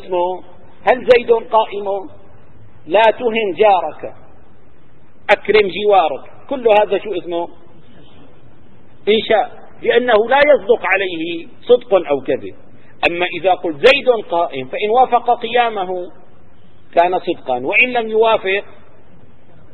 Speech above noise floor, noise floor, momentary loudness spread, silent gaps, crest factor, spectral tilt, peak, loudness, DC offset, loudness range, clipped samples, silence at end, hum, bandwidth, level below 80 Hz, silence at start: 34 dB; -49 dBFS; 12 LU; none; 16 dB; -5.5 dB/octave; 0 dBFS; -15 LUFS; 3%; 3 LU; under 0.1%; 1.1 s; none; 7.8 kHz; -52 dBFS; 0 s